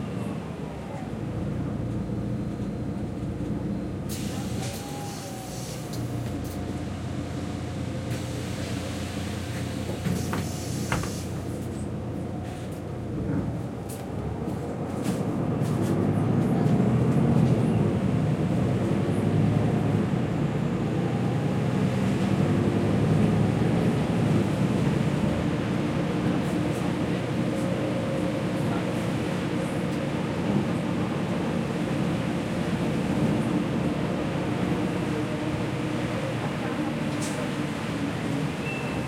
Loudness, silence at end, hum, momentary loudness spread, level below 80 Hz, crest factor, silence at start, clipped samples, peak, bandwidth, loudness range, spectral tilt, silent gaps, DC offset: -27 LUFS; 0 s; none; 9 LU; -48 dBFS; 16 dB; 0 s; under 0.1%; -10 dBFS; 16.5 kHz; 8 LU; -7 dB/octave; none; under 0.1%